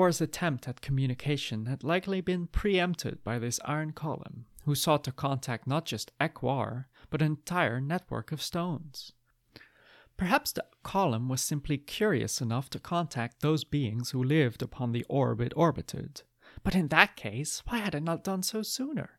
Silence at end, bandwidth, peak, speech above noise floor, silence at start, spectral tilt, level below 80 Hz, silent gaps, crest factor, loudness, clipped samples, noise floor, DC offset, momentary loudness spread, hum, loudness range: 0.1 s; 16.5 kHz; -2 dBFS; 30 dB; 0 s; -5 dB/octave; -50 dBFS; none; 28 dB; -31 LUFS; under 0.1%; -60 dBFS; under 0.1%; 10 LU; none; 4 LU